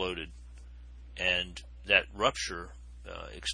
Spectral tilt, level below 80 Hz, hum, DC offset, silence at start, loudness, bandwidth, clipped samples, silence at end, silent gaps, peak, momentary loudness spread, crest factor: -2.5 dB/octave; -48 dBFS; 60 Hz at -50 dBFS; under 0.1%; 0 s; -30 LUFS; 10.5 kHz; under 0.1%; 0 s; none; -8 dBFS; 25 LU; 26 dB